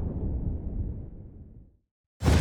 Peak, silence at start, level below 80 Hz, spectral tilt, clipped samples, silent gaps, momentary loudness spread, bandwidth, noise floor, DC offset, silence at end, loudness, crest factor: -10 dBFS; 0 s; -34 dBFS; -6.5 dB/octave; under 0.1%; 1.91-2.20 s; 20 LU; 15 kHz; -50 dBFS; under 0.1%; 0 s; -32 LUFS; 20 dB